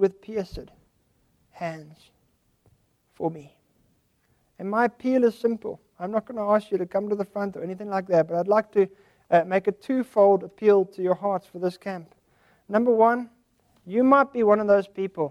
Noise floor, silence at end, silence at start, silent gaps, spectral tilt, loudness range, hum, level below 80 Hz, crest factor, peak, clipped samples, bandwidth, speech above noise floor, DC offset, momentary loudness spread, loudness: -67 dBFS; 0 s; 0 s; none; -8 dB/octave; 16 LU; none; -60 dBFS; 18 dB; -6 dBFS; under 0.1%; 12.5 kHz; 44 dB; under 0.1%; 16 LU; -24 LUFS